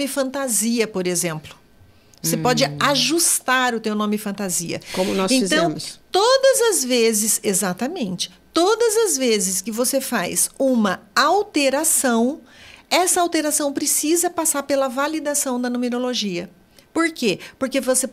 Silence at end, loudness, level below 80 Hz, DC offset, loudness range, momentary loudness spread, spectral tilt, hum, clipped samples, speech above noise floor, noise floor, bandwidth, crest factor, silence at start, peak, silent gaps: 0 s; -19 LUFS; -60 dBFS; under 0.1%; 3 LU; 8 LU; -2.5 dB/octave; none; under 0.1%; 31 dB; -51 dBFS; 16 kHz; 18 dB; 0 s; -2 dBFS; none